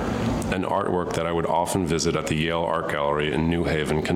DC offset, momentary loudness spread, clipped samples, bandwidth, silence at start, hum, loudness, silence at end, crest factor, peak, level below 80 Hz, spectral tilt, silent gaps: under 0.1%; 2 LU; under 0.1%; 16 kHz; 0 s; none; -24 LUFS; 0 s; 14 dB; -10 dBFS; -40 dBFS; -5.5 dB/octave; none